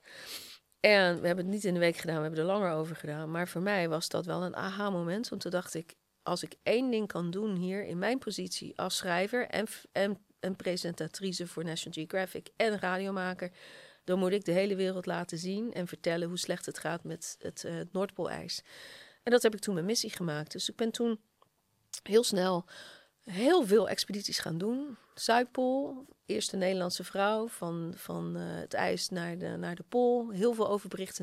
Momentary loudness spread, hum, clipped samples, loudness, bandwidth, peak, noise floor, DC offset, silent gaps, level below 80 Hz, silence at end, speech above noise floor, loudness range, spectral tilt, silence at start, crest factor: 12 LU; none; under 0.1%; -32 LUFS; 15.5 kHz; -8 dBFS; -74 dBFS; under 0.1%; none; -74 dBFS; 0 s; 42 dB; 5 LU; -4.5 dB/octave; 0.05 s; 26 dB